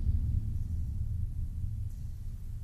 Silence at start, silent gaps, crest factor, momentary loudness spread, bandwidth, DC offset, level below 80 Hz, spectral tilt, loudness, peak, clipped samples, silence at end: 0 s; none; 14 dB; 10 LU; 12.5 kHz; under 0.1%; -34 dBFS; -9 dB/octave; -37 LUFS; -20 dBFS; under 0.1%; 0 s